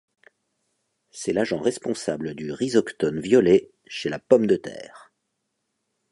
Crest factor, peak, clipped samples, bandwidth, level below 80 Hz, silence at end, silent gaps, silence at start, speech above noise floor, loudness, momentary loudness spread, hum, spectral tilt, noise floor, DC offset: 22 dB; -2 dBFS; under 0.1%; 11.5 kHz; -60 dBFS; 1.15 s; none; 1.15 s; 55 dB; -23 LUFS; 14 LU; none; -5.5 dB/octave; -77 dBFS; under 0.1%